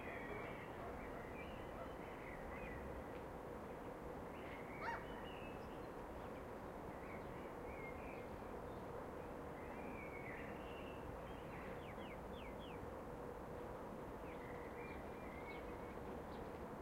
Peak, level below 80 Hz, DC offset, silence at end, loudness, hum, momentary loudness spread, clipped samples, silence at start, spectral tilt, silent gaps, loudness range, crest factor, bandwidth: -34 dBFS; -62 dBFS; under 0.1%; 0 s; -51 LUFS; none; 2 LU; under 0.1%; 0 s; -6.5 dB/octave; none; 1 LU; 16 dB; 16 kHz